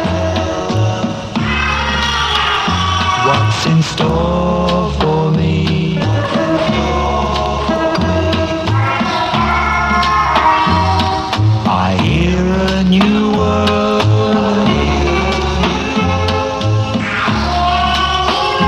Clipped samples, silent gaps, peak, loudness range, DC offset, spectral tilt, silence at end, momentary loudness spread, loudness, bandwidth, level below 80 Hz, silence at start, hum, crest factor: under 0.1%; none; 0 dBFS; 2 LU; under 0.1%; -6 dB/octave; 0 s; 4 LU; -14 LUFS; 11.5 kHz; -26 dBFS; 0 s; none; 14 dB